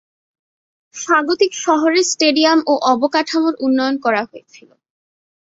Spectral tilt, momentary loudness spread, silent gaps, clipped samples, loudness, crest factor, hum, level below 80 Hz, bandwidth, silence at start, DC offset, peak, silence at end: -1.5 dB/octave; 6 LU; none; under 0.1%; -15 LUFS; 16 dB; none; -66 dBFS; 7.8 kHz; 0.95 s; under 0.1%; -2 dBFS; 1.05 s